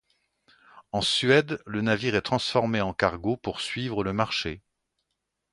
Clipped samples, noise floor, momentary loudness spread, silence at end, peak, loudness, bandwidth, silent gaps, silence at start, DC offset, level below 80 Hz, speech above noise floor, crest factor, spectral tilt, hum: under 0.1%; -81 dBFS; 9 LU; 0.95 s; -6 dBFS; -26 LUFS; 11.5 kHz; none; 0.75 s; under 0.1%; -54 dBFS; 55 dB; 22 dB; -5 dB/octave; none